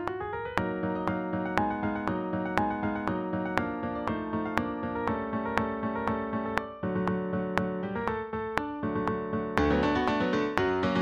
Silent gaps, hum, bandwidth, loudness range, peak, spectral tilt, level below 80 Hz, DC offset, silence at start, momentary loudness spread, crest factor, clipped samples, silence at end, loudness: none; none; 13 kHz; 2 LU; -4 dBFS; -7 dB/octave; -50 dBFS; under 0.1%; 0 s; 5 LU; 26 dB; under 0.1%; 0 s; -30 LUFS